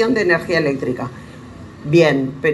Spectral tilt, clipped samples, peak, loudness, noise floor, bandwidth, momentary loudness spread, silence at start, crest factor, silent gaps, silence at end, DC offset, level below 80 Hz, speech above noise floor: -6.5 dB/octave; under 0.1%; -2 dBFS; -17 LUFS; -36 dBFS; 11.5 kHz; 23 LU; 0 s; 16 dB; none; 0 s; under 0.1%; -50 dBFS; 20 dB